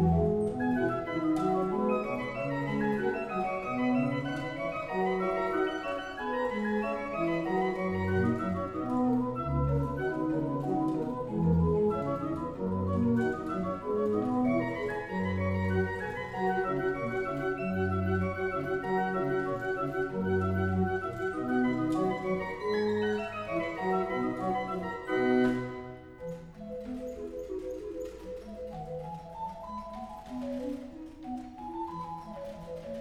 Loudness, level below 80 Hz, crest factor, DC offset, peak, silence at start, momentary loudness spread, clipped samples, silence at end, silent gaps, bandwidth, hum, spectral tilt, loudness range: -32 LUFS; -50 dBFS; 16 dB; under 0.1%; -16 dBFS; 0 s; 12 LU; under 0.1%; 0 s; none; 13 kHz; none; -8 dB/octave; 10 LU